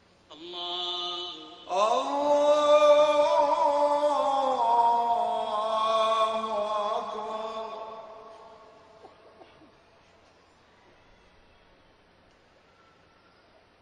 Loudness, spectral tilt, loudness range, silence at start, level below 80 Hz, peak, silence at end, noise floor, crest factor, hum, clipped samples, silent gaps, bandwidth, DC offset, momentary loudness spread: -25 LUFS; -2.5 dB/octave; 15 LU; 0.3 s; -70 dBFS; -10 dBFS; 4.75 s; -60 dBFS; 18 dB; none; under 0.1%; none; 10.5 kHz; under 0.1%; 18 LU